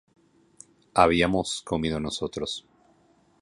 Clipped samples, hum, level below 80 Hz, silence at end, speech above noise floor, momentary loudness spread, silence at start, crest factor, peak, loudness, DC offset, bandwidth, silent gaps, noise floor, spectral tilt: under 0.1%; none; -48 dBFS; 0.8 s; 37 dB; 12 LU; 0.95 s; 24 dB; -4 dBFS; -26 LUFS; under 0.1%; 11.5 kHz; none; -62 dBFS; -4.5 dB/octave